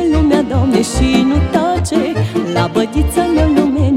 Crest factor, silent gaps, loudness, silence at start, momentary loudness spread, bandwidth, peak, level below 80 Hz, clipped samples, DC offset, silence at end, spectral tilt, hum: 12 dB; none; -14 LUFS; 0 s; 4 LU; 15.5 kHz; 0 dBFS; -22 dBFS; under 0.1%; under 0.1%; 0 s; -6.5 dB/octave; none